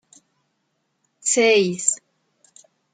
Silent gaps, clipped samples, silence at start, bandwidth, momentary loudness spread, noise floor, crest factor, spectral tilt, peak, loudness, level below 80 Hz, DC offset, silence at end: none; under 0.1%; 1.25 s; 9.6 kHz; 11 LU; -72 dBFS; 20 dB; -2 dB/octave; -4 dBFS; -19 LUFS; -74 dBFS; under 0.1%; 0.95 s